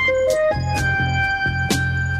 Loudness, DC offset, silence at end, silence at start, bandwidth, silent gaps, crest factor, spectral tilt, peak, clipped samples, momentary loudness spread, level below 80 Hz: -19 LUFS; 0.1%; 0 s; 0 s; 15.5 kHz; none; 14 dB; -5 dB/octave; -6 dBFS; under 0.1%; 2 LU; -34 dBFS